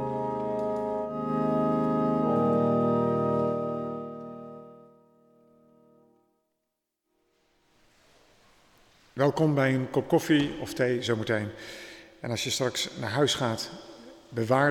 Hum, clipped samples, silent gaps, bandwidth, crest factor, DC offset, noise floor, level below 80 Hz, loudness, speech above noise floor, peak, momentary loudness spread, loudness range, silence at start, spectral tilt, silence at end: none; under 0.1%; none; 18.5 kHz; 20 dB; under 0.1%; -82 dBFS; -62 dBFS; -27 LUFS; 56 dB; -8 dBFS; 17 LU; 9 LU; 0 s; -5.5 dB/octave; 0 s